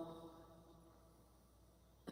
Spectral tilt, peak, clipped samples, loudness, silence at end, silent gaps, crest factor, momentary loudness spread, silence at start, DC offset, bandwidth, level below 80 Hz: -6 dB/octave; -36 dBFS; under 0.1%; -62 LUFS; 0 s; none; 22 dB; 13 LU; 0 s; under 0.1%; 16 kHz; -72 dBFS